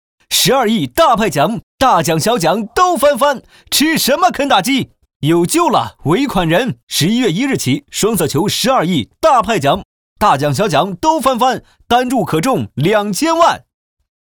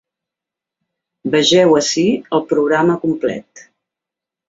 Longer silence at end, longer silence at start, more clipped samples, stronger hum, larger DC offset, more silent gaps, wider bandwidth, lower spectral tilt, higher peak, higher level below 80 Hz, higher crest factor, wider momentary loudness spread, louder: second, 0.65 s vs 0.9 s; second, 0.3 s vs 1.25 s; neither; neither; first, 0.2% vs under 0.1%; first, 1.63-1.78 s, 5.16-5.20 s, 6.83-6.87 s, 9.85-10.16 s vs none; first, over 20 kHz vs 8 kHz; about the same, -4 dB/octave vs -4 dB/octave; about the same, 0 dBFS vs -2 dBFS; first, -42 dBFS vs -58 dBFS; about the same, 14 dB vs 16 dB; second, 5 LU vs 11 LU; about the same, -14 LUFS vs -15 LUFS